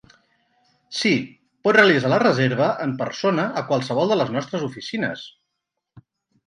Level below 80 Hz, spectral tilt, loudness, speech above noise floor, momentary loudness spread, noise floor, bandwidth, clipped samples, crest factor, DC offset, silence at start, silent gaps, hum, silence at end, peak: -66 dBFS; -5.5 dB/octave; -21 LUFS; 60 dB; 13 LU; -80 dBFS; 11 kHz; under 0.1%; 20 dB; under 0.1%; 0.9 s; none; none; 0.5 s; -2 dBFS